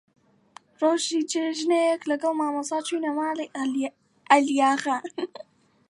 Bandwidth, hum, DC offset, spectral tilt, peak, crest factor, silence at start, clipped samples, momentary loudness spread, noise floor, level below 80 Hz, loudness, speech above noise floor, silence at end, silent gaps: 11.5 kHz; none; under 0.1%; -2 dB/octave; -4 dBFS; 22 dB; 0.8 s; under 0.1%; 9 LU; -53 dBFS; -82 dBFS; -25 LUFS; 29 dB; 0.45 s; none